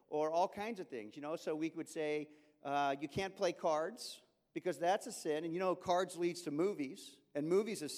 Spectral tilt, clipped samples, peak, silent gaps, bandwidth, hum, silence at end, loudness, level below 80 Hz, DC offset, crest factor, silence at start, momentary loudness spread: -4.5 dB/octave; under 0.1%; -22 dBFS; none; 16 kHz; none; 0 s; -39 LUFS; -78 dBFS; under 0.1%; 18 dB; 0.1 s; 12 LU